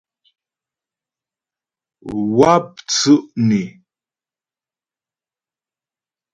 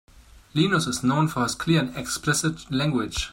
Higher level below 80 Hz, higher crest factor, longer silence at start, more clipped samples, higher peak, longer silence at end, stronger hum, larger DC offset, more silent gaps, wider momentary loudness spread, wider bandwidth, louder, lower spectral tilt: second, -56 dBFS vs -46 dBFS; about the same, 20 dB vs 16 dB; first, 2.05 s vs 0.55 s; neither; first, 0 dBFS vs -8 dBFS; first, 2.65 s vs 0 s; neither; neither; neither; first, 15 LU vs 5 LU; second, 9.4 kHz vs 16.5 kHz; first, -16 LUFS vs -24 LUFS; about the same, -5 dB/octave vs -4.5 dB/octave